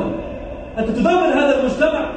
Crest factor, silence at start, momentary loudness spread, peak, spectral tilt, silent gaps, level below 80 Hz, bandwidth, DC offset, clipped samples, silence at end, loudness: 12 dB; 0 s; 14 LU; -4 dBFS; -6 dB/octave; none; -38 dBFS; 9 kHz; under 0.1%; under 0.1%; 0 s; -17 LUFS